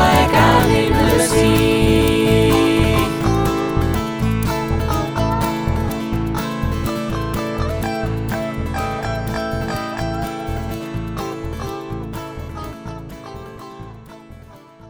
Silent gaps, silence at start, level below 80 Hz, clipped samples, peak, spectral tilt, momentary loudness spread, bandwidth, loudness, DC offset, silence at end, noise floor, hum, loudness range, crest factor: none; 0 s; -28 dBFS; under 0.1%; -2 dBFS; -5.5 dB/octave; 17 LU; over 20 kHz; -18 LUFS; under 0.1%; 0 s; -41 dBFS; none; 13 LU; 16 dB